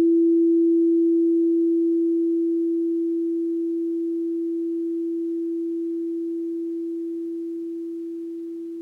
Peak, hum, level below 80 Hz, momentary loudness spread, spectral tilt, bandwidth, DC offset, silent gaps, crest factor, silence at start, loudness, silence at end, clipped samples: -14 dBFS; none; -84 dBFS; 13 LU; -8.5 dB/octave; 0.6 kHz; under 0.1%; none; 8 dB; 0 s; -24 LUFS; 0 s; under 0.1%